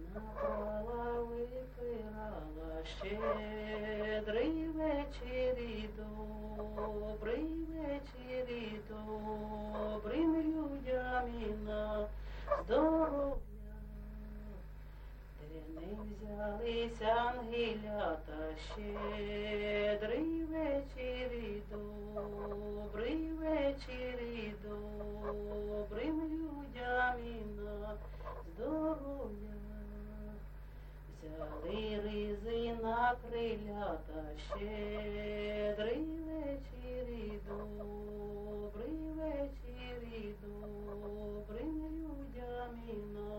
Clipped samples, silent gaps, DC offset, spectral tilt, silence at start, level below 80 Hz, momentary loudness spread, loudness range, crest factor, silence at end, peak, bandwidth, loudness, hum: under 0.1%; none; under 0.1%; -7 dB/octave; 0 s; -50 dBFS; 13 LU; 6 LU; 20 dB; 0 s; -20 dBFS; 16.5 kHz; -40 LUFS; 50 Hz at -50 dBFS